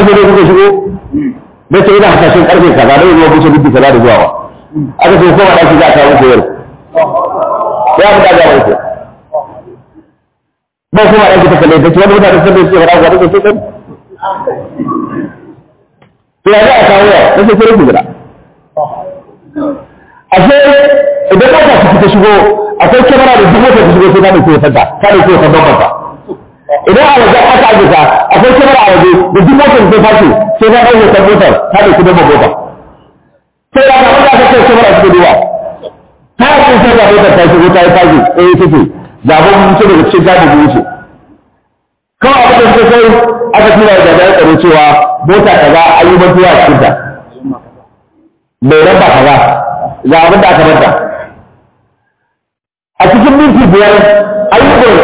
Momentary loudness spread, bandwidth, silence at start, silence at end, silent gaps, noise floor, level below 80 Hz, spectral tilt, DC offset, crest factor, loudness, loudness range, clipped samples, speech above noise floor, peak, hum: 14 LU; 4 kHz; 0 s; 0 s; none; -77 dBFS; -30 dBFS; -10 dB/octave; under 0.1%; 4 dB; -4 LUFS; 5 LU; 5%; 74 dB; 0 dBFS; none